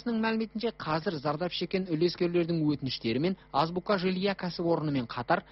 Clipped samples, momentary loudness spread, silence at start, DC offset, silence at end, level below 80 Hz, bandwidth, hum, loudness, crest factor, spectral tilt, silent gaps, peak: under 0.1%; 4 LU; 0.05 s; under 0.1%; 0.1 s; -60 dBFS; 6 kHz; none; -30 LUFS; 16 dB; -5 dB/octave; none; -14 dBFS